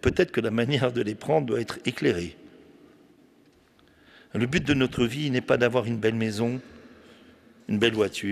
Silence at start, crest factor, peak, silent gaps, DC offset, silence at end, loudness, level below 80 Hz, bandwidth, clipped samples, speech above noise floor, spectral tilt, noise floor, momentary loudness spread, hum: 0.05 s; 20 dB; -8 dBFS; none; under 0.1%; 0 s; -26 LUFS; -52 dBFS; 14.5 kHz; under 0.1%; 34 dB; -6 dB/octave; -59 dBFS; 8 LU; none